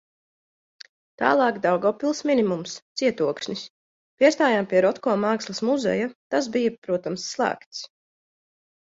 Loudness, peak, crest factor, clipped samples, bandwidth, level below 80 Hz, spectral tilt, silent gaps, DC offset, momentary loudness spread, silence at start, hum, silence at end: -23 LUFS; -4 dBFS; 20 dB; under 0.1%; 7.8 kHz; -70 dBFS; -4.5 dB/octave; 2.82-2.95 s, 3.70-4.17 s, 6.15-6.30 s, 6.78-6.82 s, 7.66-7.71 s; under 0.1%; 12 LU; 1.2 s; none; 1.05 s